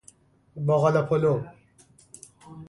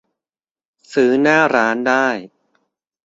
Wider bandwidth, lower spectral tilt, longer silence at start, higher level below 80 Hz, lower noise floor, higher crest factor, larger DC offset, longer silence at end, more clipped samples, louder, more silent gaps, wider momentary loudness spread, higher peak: first, 11.5 kHz vs 7.8 kHz; first, -8 dB/octave vs -5 dB/octave; second, 0.55 s vs 0.9 s; about the same, -62 dBFS vs -64 dBFS; second, -58 dBFS vs under -90 dBFS; about the same, 18 dB vs 16 dB; neither; second, 0.05 s vs 0.8 s; neither; second, -24 LUFS vs -15 LUFS; neither; first, 25 LU vs 9 LU; second, -8 dBFS vs -2 dBFS